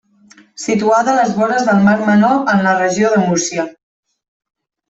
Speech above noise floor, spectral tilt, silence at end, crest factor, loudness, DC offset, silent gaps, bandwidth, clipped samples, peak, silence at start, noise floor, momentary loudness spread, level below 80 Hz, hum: 34 dB; -5 dB/octave; 1.2 s; 12 dB; -13 LUFS; under 0.1%; none; 8 kHz; under 0.1%; -2 dBFS; 0.6 s; -47 dBFS; 8 LU; -56 dBFS; none